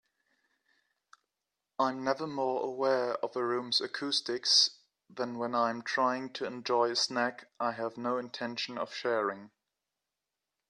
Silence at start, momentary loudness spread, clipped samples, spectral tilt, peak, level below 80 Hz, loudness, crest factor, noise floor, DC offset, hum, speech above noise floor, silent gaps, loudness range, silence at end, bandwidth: 1.8 s; 9 LU; under 0.1%; -2.5 dB/octave; -12 dBFS; -84 dBFS; -31 LUFS; 20 dB; -88 dBFS; under 0.1%; none; 56 dB; none; 5 LU; 1.25 s; 11.5 kHz